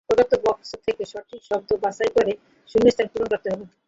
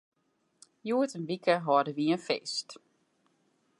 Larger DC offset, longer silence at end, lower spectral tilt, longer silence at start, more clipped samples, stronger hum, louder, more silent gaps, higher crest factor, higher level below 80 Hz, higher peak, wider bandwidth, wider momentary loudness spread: neither; second, 0.2 s vs 1.05 s; about the same, -5.5 dB/octave vs -5 dB/octave; second, 0.1 s vs 0.85 s; neither; neither; first, -23 LUFS vs -30 LUFS; neither; about the same, 18 dB vs 20 dB; first, -52 dBFS vs -86 dBFS; first, -4 dBFS vs -12 dBFS; second, 7.8 kHz vs 11.5 kHz; about the same, 12 LU vs 10 LU